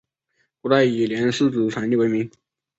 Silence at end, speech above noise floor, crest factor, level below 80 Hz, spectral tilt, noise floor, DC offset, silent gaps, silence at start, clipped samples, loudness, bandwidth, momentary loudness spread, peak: 0.5 s; 51 dB; 18 dB; -62 dBFS; -6 dB/octave; -70 dBFS; under 0.1%; none; 0.65 s; under 0.1%; -20 LUFS; 8 kHz; 9 LU; -4 dBFS